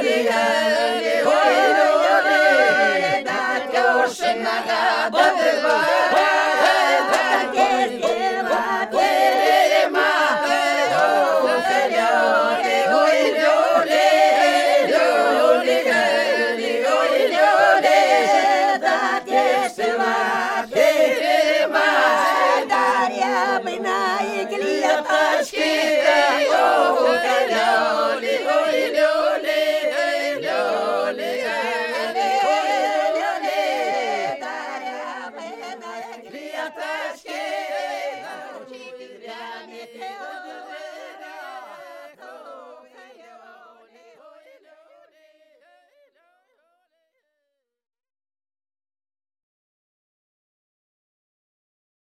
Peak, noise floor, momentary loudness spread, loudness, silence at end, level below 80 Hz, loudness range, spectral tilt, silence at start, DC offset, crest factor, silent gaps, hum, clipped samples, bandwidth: -2 dBFS; -78 dBFS; 18 LU; -18 LUFS; 9.4 s; -68 dBFS; 14 LU; -2 dB/octave; 0 s; under 0.1%; 18 dB; none; none; under 0.1%; 15.5 kHz